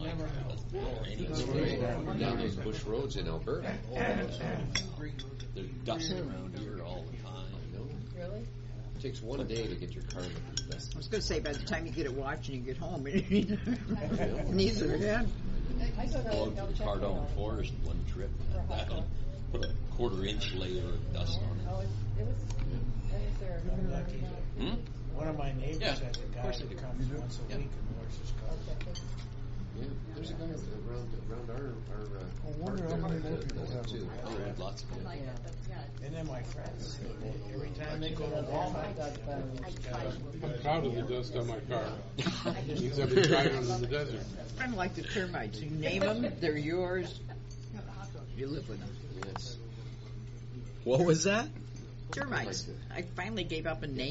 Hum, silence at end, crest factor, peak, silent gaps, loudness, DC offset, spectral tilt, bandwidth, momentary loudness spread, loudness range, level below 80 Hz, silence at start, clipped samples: none; 0 s; 24 dB; -12 dBFS; none; -36 LUFS; under 0.1%; -5.5 dB/octave; 8 kHz; 10 LU; 9 LU; -40 dBFS; 0 s; under 0.1%